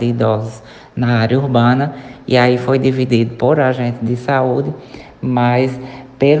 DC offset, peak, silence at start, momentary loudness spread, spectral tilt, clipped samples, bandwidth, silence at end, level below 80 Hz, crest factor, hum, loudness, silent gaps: under 0.1%; 0 dBFS; 0 s; 16 LU; -8 dB/octave; under 0.1%; 8.2 kHz; 0 s; -50 dBFS; 14 dB; none; -15 LUFS; none